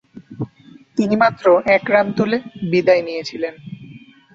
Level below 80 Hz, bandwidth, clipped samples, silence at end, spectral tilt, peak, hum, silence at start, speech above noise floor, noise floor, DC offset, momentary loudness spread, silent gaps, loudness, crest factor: -58 dBFS; 7.6 kHz; under 0.1%; 0.35 s; -6.5 dB/octave; -2 dBFS; none; 0.15 s; 29 dB; -46 dBFS; under 0.1%; 17 LU; none; -17 LUFS; 18 dB